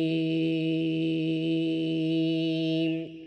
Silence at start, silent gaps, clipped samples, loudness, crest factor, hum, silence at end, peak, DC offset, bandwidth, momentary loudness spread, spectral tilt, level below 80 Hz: 0 s; none; under 0.1%; -28 LUFS; 8 dB; none; 0 s; -18 dBFS; under 0.1%; 5.8 kHz; 1 LU; -8 dB/octave; -70 dBFS